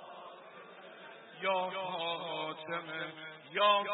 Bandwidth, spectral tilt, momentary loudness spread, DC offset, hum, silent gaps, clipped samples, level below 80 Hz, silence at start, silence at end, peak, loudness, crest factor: 4 kHz; 0 dB/octave; 21 LU; under 0.1%; none; none; under 0.1%; under -90 dBFS; 0 s; 0 s; -16 dBFS; -35 LUFS; 20 dB